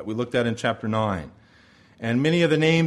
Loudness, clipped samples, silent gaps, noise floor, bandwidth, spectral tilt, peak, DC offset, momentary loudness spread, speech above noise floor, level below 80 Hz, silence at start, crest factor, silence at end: -23 LUFS; under 0.1%; none; -54 dBFS; 11.5 kHz; -6.5 dB/octave; -6 dBFS; under 0.1%; 13 LU; 32 dB; -54 dBFS; 0 s; 16 dB; 0 s